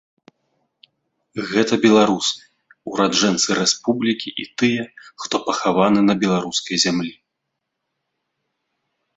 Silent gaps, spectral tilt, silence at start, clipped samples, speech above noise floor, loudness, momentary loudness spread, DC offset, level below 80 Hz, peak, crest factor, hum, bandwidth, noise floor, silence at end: none; -3.5 dB/octave; 1.35 s; under 0.1%; 60 dB; -18 LUFS; 15 LU; under 0.1%; -60 dBFS; 0 dBFS; 20 dB; none; 8 kHz; -78 dBFS; 2.05 s